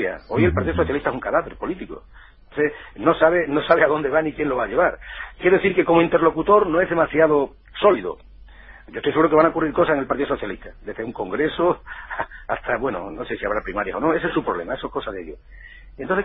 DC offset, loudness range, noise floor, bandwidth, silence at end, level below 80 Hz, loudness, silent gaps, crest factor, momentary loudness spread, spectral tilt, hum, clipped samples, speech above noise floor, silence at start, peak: under 0.1%; 7 LU; -43 dBFS; 5 kHz; 0 s; -44 dBFS; -21 LUFS; none; 18 dB; 15 LU; -11 dB/octave; none; under 0.1%; 23 dB; 0 s; -2 dBFS